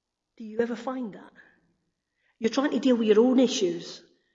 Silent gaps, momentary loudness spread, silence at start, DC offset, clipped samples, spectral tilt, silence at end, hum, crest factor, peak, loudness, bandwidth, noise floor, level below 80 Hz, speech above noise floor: none; 19 LU; 0.4 s; under 0.1%; under 0.1%; -4.5 dB/octave; 0.35 s; none; 18 dB; -10 dBFS; -25 LUFS; 7.8 kHz; -77 dBFS; -76 dBFS; 52 dB